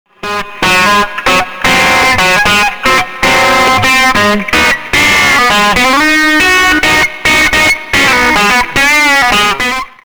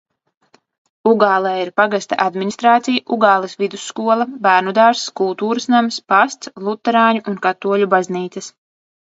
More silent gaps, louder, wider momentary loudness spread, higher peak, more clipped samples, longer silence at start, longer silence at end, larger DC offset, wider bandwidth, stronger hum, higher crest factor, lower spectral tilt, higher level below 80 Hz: neither; first, -7 LUFS vs -16 LUFS; second, 4 LU vs 9 LU; about the same, -2 dBFS vs 0 dBFS; neither; second, 0.25 s vs 1.05 s; second, 0.15 s vs 0.7 s; neither; first, over 20 kHz vs 8 kHz; neither; second, 8 dB vs 16 dB; second, -2 dB/octave vs -4.5 dB/octave; first, -30 dBFS vs -70 dBFS